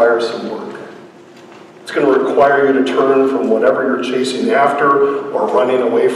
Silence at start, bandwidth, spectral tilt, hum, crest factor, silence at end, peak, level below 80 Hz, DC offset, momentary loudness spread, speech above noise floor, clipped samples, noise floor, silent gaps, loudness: 0 s; 11.5 kHz; -5 dB/octave; none; 12 dB; 0 s; -2 dBFS; -62 dBFS; under 0.1%; 13 LU; 25 dB; under 0.1%; -39 dBFS; none; -14 LUFS